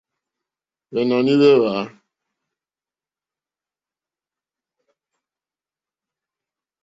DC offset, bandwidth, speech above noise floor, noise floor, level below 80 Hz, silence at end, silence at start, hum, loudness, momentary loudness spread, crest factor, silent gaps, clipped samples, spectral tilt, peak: under 0.1%; 7.8 kHz; over 74 dB; under -90 dBFS; -68 dBFS; 4.95 s; 0.9 s; none; -17 LUFS; 14 LU; 20 dB; none; under 0.1%; -7 dB/octave; -4 dBFS